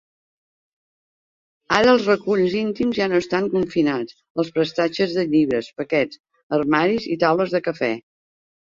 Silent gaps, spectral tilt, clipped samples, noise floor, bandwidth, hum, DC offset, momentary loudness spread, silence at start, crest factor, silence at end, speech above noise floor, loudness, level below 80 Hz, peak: 4.30-4.35 s, 6.20-6.24 s, 6.43-6.50 s; -6 dB/octave; under 0.1%; under -90 dBFS; 7.6 kHz; none; under 0.1%; 7 LU; 1.7 s; 20 dB; 0.65 s; over 70 dB; -20 LUFS; -58 dBFS; -2 dBFS